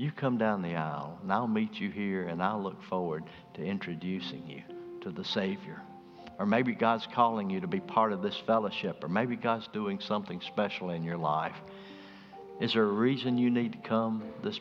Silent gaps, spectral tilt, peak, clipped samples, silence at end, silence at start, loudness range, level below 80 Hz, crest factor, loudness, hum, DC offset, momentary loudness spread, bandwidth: none; -7.5 dB/octave; -10 dBFS; under 0.1%; 0 s; 0 s; 6 LU; -72 dBFS; 22 dB; -32 LUFS; none; under 0.1%; 17 LU; 7 kHz